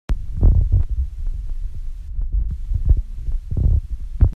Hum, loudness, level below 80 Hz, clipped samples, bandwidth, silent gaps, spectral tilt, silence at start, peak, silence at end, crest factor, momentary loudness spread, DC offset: none; -23 LUFS; -20 dBFS; under 0.1%; 2.5 kHz; none; -10 dB/octave; 0.1 s; -2 dBFS; 0 s; 16 dB; 14 LU; under 0.1%